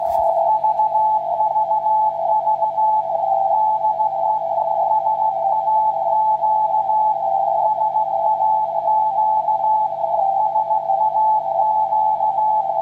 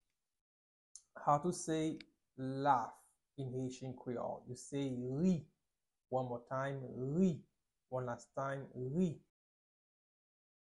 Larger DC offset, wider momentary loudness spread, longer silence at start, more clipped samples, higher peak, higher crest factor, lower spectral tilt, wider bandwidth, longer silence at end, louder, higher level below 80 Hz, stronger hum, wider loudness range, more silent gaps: neither; second, 2 LU vs 13 LU; second, 0 s vs 0.95 s; neither; first, -6 dBFS vs -20 dBFS; second, 12 dB vs 20 dB; about the same, -6.5 dB/octave vs -6.5 dB/octave; second, 4.3 kHz vs 11.5 kHz; second, 0 s vs 1.4 s; first, -18 LUFS vs -40 LUFS; first, -62 dBFS vs -72 dBFS; first, 50 Hz at -50 dBFS vs none; second, 0 LU vs 3 LU; neither